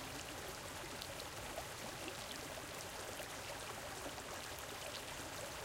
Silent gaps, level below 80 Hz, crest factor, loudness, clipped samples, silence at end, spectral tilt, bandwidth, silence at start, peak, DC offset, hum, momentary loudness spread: none; -64 dBFS; 22 dB; -46 LUFS; under 0.1%; 0 s; -2.5 dB/octave; 17 kHz; 0 s; -26 dBFS; under 0.1%; none; 1 LU